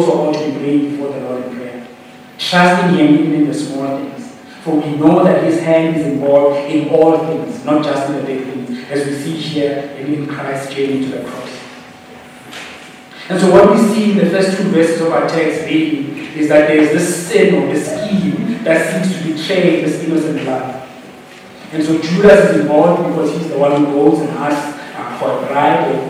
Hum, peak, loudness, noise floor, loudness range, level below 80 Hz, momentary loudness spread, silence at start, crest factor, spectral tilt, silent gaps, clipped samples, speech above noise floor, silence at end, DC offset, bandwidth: none; 0 dBFS; -14 LUFS; -37 dBFS; 7 LU; -52 dBFS; 16 LU; 0 s; 14 dB; -6 dB/octave; none; 0.3%; 24 dB; 0 s; under 0.1%; 15.5 kHz